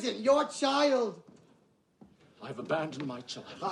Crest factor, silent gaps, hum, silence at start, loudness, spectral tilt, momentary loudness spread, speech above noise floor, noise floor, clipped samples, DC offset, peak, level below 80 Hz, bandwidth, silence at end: 18 dB; none; none; 0 s; -30 LUFS; -4 dB/octave; 17 LU; 36 dB; -67 dBFS; under 0.1%; under 0.1%; -14 dBFS; -76 dBFS; 11 kHz; 0 s